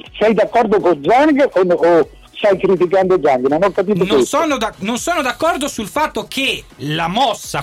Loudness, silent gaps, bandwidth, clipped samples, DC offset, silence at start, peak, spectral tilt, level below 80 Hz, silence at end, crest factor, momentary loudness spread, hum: -15 LUFS; none; 16 kHz; under 0.1%; under 0.1%; 0.05 s; -6 dBFS; -4.5 dB/octave; -46 dBFS; 0 s; 10 dB; 7 LU; none